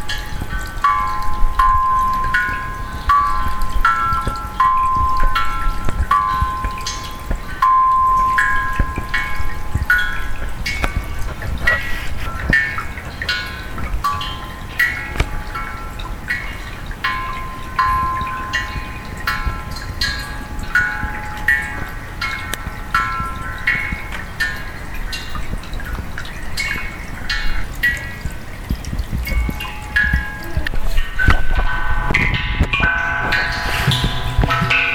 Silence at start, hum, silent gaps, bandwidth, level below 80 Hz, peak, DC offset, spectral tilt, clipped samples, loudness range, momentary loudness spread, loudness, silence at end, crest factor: 0 s; none; none; 18 kHz; -24 dBFS; 0 dBFS; under 0.1%; -4 dB/octave; under 0.1%; 6 LU; 12 LU; -20 LUFS; 0 s; 18 dB